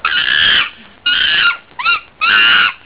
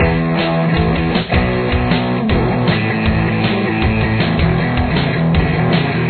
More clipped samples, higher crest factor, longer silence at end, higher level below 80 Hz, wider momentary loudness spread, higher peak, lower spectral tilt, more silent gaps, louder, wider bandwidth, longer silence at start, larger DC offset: neither; about the same, 12 dB vs 14 dB; about the same, 0.1 s vs 0 s; second, -46 dBFS vs -26 dBFS; first, 8 LU vs 1 LU; about the same, 0 dBFS vs 0 dBFS; second, -4 dB/octave vs -10 dB/octave; neither; first, -11 LUFS vs -15 LUFS; second, 4 kHz vs 4.6 kHz; about the same, 0.05 s vs 0 s; first, 0.3% vs under 0.1%